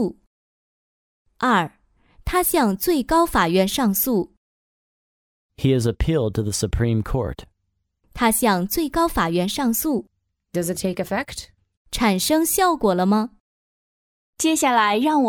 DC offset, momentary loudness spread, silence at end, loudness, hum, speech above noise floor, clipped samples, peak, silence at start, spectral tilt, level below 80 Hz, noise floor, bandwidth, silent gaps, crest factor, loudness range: under 0.1%; 10 LU; 0 s; -21 LUFS; none; 54 dB; under 0.1%; -4 dBFS; 0 s; -4.5 dB/octave; -38 dBFS; -74 dBFS; over 20 kHz; 0.27-1.25 s, 4.37-5.49 s, 11.77-11.85 s, 13.40-14.33 s; 18 dB; 4 LU